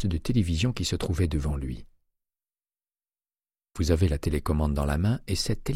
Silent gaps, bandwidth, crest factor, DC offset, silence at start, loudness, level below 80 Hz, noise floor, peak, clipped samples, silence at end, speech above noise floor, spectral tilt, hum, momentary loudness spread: none; 15 kHz; 20 dB; under 0.1%; 0 s; -27 LUFS; -34 dBFS; under -90 dBFS; -8 dBFS; under 0.1%; 0 s; over 64 dB; -6 dB/octave; none; 7 LU